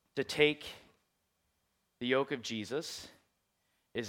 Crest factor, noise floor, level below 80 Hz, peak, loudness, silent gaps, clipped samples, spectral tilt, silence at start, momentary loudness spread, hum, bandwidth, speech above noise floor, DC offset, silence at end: 26 dB; -80 dBFS; -74 dBFS; -10 dBFS; -34 LUFS; none; under 0.1%; -4 dB/octave; 0.15 s; 18 LU; none; 16.5 kHz; 46 dB; under 0.1%; 0 s